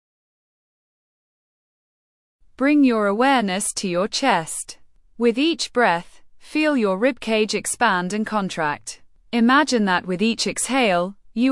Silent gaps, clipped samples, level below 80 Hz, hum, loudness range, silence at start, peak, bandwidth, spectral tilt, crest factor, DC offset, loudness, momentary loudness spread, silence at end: none; under 0.1%; -58 dBFS; none; 2 LU; 2.6 s; -4 dBFS; 12 kHz; -3.5 dB/octave; 16 dB; under 0.1%; -20 LUFS; 9 LU; 0 s